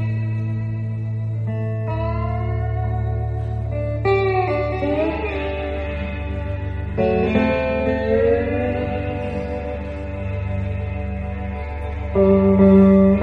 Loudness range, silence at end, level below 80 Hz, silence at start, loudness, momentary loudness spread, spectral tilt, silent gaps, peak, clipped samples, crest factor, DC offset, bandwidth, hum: 4 LU; 0 s; -30 dBFS; 0 s; -21 LUFS; 12 LU; -10 dB/octave; none; -2 dBFS; under 0.1%; 16 dB; under 0.1%; 5.4 kHz; none